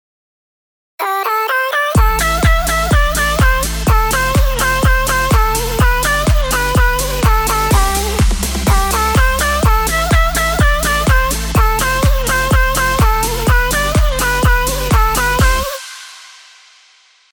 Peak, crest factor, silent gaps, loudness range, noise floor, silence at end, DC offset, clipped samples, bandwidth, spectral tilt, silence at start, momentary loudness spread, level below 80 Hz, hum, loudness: 0 dBFS; 12 dB; none; 1 LU; -49 dBFS; 1.05 s; under 0.1%; under 0.1%; over 20 kHz; -4 dB/octave; 1 s; 3 LU; -16 dBFS; none; -14 LUFS